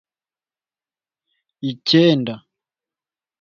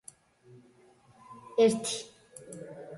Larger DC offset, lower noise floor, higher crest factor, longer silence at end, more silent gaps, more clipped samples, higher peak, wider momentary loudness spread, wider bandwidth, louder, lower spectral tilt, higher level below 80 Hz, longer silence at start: neither; first, under -90 dBFS vs -61 dBFS; about the same, 20 dB vs 20 dB; first, 1.05 s vs 0 s; neither; neither; first, -2 dBFS vs -14 dBFS; second, 15 LU vs 26 LU; second, 7 kHz vs 11.5 kHz; first, -17 LUFS vs -28 LUFS; first, -6.5 dB/octave vs -4 dB/octave; first, -66 dBFS vs -74 dBFS; first, 1.65 s vs 1.3 s